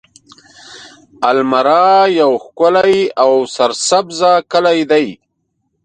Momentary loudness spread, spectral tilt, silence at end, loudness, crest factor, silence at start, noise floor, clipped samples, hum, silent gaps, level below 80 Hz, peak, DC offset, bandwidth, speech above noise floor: 5 LU; -3.5 dB/octave; 0.7 s; -12 LUFS; 14 dB; 0.7 s; -67 dBFS; under 0.1%; none; none; -60 dBFS; 0 dBFS; under 0.1%; 9.4 kHz; 56 dB